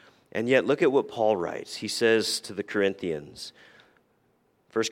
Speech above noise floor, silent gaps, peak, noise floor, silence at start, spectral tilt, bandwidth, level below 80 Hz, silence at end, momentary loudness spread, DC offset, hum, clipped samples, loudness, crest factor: 42 dB; none; -8 dBFS; -68 dBFS; 0.35 s; -4 dB/octave; 16.5 kHz; -70 dBFS; 0 s; 13 LU; under 0.1%; none; under 0.1%; -26 LUFS; 20 dB